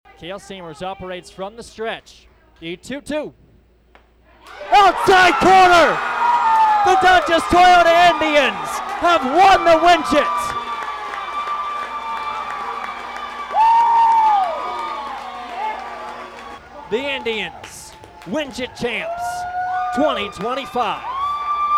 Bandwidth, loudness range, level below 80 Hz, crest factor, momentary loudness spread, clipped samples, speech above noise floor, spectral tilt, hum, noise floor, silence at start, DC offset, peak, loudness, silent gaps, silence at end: 15 kHz; 14 LU; -46 dBFS; 12 dB; 20 LU; under 0.1%; 37 dB; -3.5 dB/octave; none; -52 dBFS; 0.2 s; under 0.1%; -6 dBFS; -16 LUFS; none; 0 s